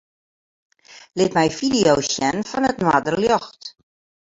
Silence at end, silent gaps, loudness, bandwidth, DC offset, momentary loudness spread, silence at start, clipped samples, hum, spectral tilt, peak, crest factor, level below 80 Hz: 0.65 s; none; -19 LUFS; 8 kHz; under 0.1%; 16 LU; 0.9 s; under 0.1%; none; -4 dB/octave; -2 dBFS; 18 dB; -52 dBFS